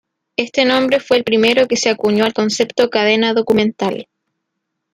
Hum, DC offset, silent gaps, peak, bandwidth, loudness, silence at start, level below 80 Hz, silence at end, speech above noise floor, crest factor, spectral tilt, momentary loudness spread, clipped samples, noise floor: none; under 0.1%; none; -2 dBFS; 15.5 kHz; -15 LUFS; 0.4 s; -56 dBFS; 0.9 s; 61 dB; 14 dB; -3.5 dB/octave; 9 LU; under 0.1%; -75 dBFS